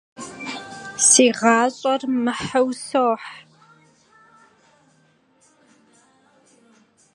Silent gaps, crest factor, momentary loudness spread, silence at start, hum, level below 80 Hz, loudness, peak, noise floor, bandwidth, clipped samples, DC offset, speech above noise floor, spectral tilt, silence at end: none; 22 dB; 20 LU; 0.2 s; none; -64 dBFS; -18 LUFS; -2 dBFS; -60 dBFS; 11.5 kHz; under 0.1%; under 0.1%; 41 dB; -2 dB/octave; 3.75 s